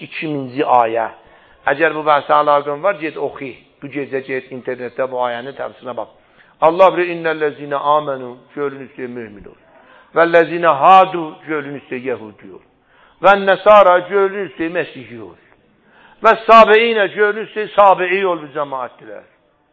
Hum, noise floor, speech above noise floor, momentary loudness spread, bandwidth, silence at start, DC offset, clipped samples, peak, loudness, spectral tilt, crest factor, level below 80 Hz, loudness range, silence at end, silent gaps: none; -52 dBFS; 37 dB; 19 LU; 7.6 kHz; 0 s; under 0.1%; 0.1%; 0 dBFS; -14 LUFS; -6.5 dB/octave; 16 dB; -58 dBFS; 8 LU; 0.55 s; none